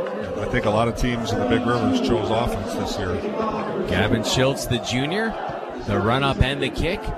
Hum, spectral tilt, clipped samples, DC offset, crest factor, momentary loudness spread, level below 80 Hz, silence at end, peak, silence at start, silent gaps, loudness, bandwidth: none; -5.5 dB/octave; under 0.1%; under 0.1%; 18 dB; 6 LU; -34 dBFS; 0 s; -4 dBFS; 0 s; none; -22 LUFS; 14 kHz